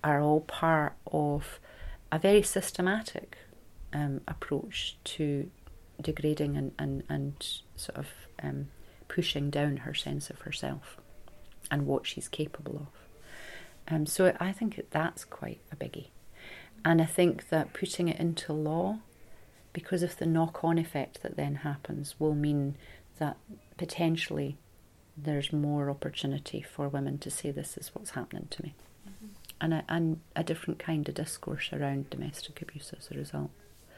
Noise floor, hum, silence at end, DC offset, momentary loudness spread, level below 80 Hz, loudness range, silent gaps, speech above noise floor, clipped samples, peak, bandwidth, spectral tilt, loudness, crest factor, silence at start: -59 dBFS; none; 0 s; under 0.1%; 18 LU; -54 dBFS; 6 LU; none; 27 dB; under 0.1%; -12 dBFS; 16 kHz; -5.5 dB/octave; -32 LUFS; 22 dB; 0.05 s